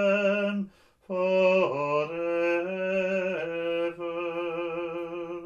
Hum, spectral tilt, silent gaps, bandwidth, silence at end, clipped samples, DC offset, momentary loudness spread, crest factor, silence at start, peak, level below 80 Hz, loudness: none; -6.5 dB/octave; none; 7.2 kHz; 0 s; under 0.1%; under 0.1%; 11 LU; 16 dB; 0 s; -12 dBFS; -68 dBFS; -28 LUFS